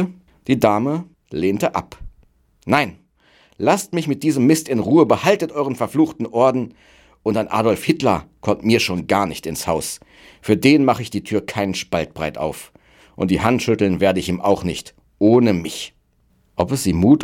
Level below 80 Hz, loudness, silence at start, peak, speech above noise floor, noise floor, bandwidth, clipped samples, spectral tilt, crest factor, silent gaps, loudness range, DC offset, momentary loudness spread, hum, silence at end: -46 dBFS; -19 LUFS; 0 s; -2 dBFS; 42 dB; -60 dBFS; 16.5 kHz; under 0.1%; -5.5 dB/octave; 18 dB; none; 4 LU; under 0.1%; 13 LU; none; 0 s